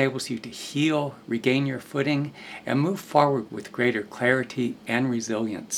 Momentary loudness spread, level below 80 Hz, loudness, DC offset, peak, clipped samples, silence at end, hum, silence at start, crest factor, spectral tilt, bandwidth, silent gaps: 9 LU; -68 dBFS; -26 LUFS; under 0.1%; -4 dBFS; under 0.1%; 0 s; none; 0 s; 20 dB; -5 dB/octave; 16 kHz; none